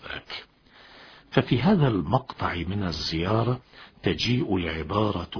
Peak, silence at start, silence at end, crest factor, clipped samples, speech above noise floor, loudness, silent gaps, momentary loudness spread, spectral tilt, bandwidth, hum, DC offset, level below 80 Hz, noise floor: -4 dBFS; 0 s; 0 s; 22 dB; under 0.1%; 28 dB; -26 LUFS; none; 11 LU; -6.5 dB/octave; 5.4 kHz; none; under 0.1%; -46 dBFS; -53 dBFS